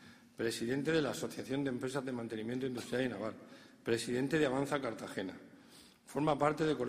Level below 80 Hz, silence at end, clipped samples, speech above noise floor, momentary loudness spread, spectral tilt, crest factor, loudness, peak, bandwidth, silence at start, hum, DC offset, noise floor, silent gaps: -68 dBFS; 0 s; under 0.1%; 24 dB; 12 LU; -5.5 dB/octave; 20 dB; -37 LUFS; -16 dBFS; 15 kHz; 0 s; none; under 0.1%; -60 dBFS; none